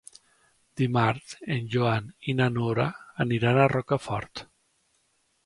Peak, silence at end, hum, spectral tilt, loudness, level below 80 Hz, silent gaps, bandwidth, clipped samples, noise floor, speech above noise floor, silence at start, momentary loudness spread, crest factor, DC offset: -8 dBFS; 1 s; none; -7 dB/octave; -26 LUFS; -58 dBFS; none; 11.5 kHz; under 0.1%; -70 dBFS; 45 dB; 0.75 s; 11 LU; 20 dB; under 0.1%